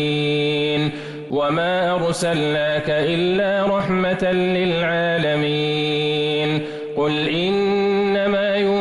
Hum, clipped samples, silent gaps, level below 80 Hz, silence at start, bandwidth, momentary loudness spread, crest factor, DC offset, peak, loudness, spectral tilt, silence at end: none; under 0.1%; none; -52 dBFS; 0 s; 12 kHz; 3 LU; 8 dB; under 0.1%; -10 dBFS; -19 LUFS; -5.5 dB/octave; 0 s